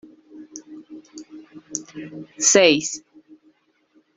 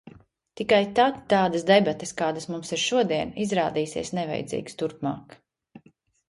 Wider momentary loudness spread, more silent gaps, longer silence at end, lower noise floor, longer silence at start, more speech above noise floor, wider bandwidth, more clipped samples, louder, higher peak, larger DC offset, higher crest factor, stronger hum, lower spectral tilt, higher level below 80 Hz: first, 27 LU vs 12 LU; neither; first, 1.2 s vs 0.5 s; about the same, -61 dBFS vs -60 dBFS; first, 0.35 s vs 0.05 s; first, 42 dB vs 36 dB; second, 8.2 kHz vs 11.5 kHz; neither; first, -18 LUFS vs -25 LUFS; first, -2 dBFS vs -6 dBFS; neither; about the same, 24 dB vs 20 dB; neither; second, -1.5 dB/octave vs -4.5 dB/octave; second, -68 dBFS vs -60 dBFS